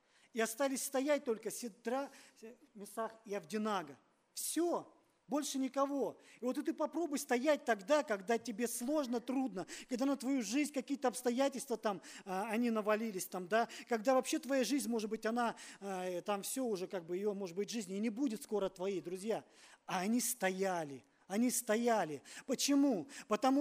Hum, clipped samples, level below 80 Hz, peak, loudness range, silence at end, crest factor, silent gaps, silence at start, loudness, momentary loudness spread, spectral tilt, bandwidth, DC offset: none; under 0.1%; -82 dBFS; -20 dBFS; 4 LU; 0 s; 18 dB; none; 0.35 s; -37 LUFS; 10 LU; -3.5 dB/octave; 15.5 kHz; under 0.1%